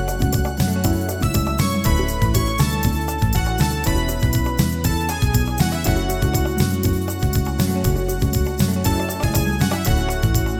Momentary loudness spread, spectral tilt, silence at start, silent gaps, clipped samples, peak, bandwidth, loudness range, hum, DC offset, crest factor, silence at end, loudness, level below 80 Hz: 2 LU; -5.5 dB/octave; 0 s; none; under 0.1%; -4 dBFS; over 20 kHz; 1 LU; none; under 0.1%; 14 dB; 0 s; -20 LUFS; -24 dBFS